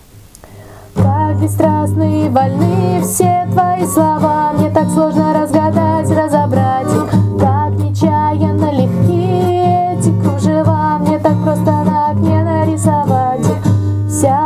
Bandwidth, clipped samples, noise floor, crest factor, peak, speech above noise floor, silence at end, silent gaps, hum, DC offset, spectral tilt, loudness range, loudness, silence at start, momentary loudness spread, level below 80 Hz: 15.5 kHz; under 0.1%; -38 dBFS; 12 dB; 0 dBFS; 26 dB; 0 s; none; none; under 0.1%; -7.5 dB/octave; 1 LU; -13 LUFS; 0.15 s; 2 LU; -34 dBFS